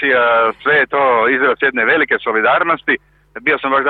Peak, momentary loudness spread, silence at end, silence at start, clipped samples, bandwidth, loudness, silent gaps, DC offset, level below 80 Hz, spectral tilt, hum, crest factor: -2 dBFS; 5 LU; 0 s; 0 s; under 0.1%; 4.6 kHz; -14 LUFS; none; under 0.1%; -56 dBFS; -7.5 dB/octave; none; 12 dB